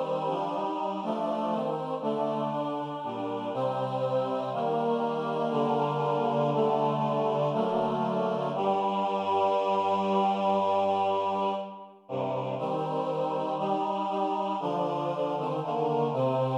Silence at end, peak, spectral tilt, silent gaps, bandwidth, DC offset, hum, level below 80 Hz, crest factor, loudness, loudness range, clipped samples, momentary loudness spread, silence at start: 0 s; -14 dBFS; -7.5 dB/octave; none; 10 kHz; under 0.1%; none; -78 dBFS; 14 dB; -29 LUFS; 4 LU; under 0.1%; 6 LU; 0 s